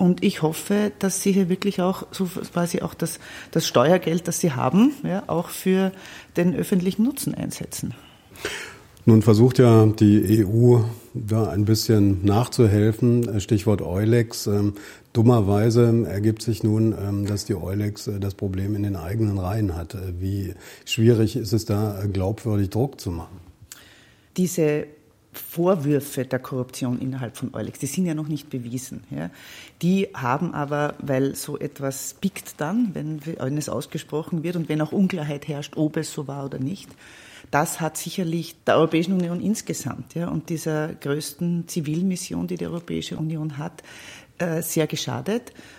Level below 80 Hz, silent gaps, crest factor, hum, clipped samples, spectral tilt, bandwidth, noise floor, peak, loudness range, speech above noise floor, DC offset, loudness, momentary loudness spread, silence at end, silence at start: -56 dBFS; none; 20 dB; none; under 0.1%; -6.5 dB/octave; 16.5 kHz; -52 dBFS; -2 dBFS; 9 LU; 30 dB; under 0.1%; -23 LUFS; 13 LU; 0.05 s; 0 s